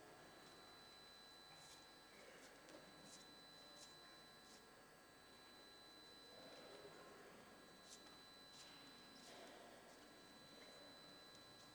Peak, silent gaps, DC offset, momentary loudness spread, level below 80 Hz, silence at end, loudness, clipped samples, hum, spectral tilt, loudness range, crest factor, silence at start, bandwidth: -44 dBFS; none; under 0.1%; 3 LU; -86 dBFS; 0 s; -61 LUFS; under 0.1%; none; -2 dB/octave; 1 LU; 20 dB; 0 s; over 20 kHz